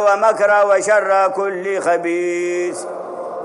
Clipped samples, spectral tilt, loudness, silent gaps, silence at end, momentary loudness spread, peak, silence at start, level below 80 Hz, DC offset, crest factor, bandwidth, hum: under 0.1%; -3.5 dB/octave; -16 LUFS; none; 0 s; 14 LU; -2 dBFS; 0 s; -74 dBFS; under 0.1%; 14 dB; 11.5 kHz; none